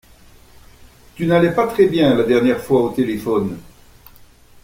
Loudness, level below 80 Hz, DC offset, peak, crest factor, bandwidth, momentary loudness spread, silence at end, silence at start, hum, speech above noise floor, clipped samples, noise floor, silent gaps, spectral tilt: -17 LUFS; -48 dBFS; under 0.1%; -2 dBFS; 16 dB; 16.5 kHz; 8 LU; 1 s; 1.2 s; none; 30 dB; under 0.1%; -46 dBFS; none; -7 dB/octave